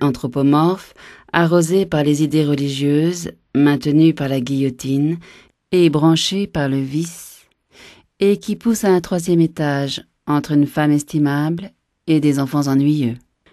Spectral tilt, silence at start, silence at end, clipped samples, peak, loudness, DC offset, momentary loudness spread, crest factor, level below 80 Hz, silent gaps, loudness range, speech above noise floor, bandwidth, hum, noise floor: -6 dB/octave; 0 s; 0.35 s; under 0.1%; 0 dBFS; -17 LUFS; under 0.1%; 9 LU; 18 dB; -52 dBFS; none; 3 LU; 32 dB; 13 kHz; none; -48 dBFS